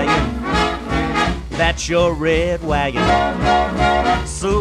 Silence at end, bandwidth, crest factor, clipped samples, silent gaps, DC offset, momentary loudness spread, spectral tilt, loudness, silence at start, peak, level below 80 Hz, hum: 0 s; 12.5 kHz; 14 dB; under 0.1%; none; under 0.1%; 4 LU; -5 dB/octave; -17 LUFS; 0 s; -2 dBFS; -28 dBFS; none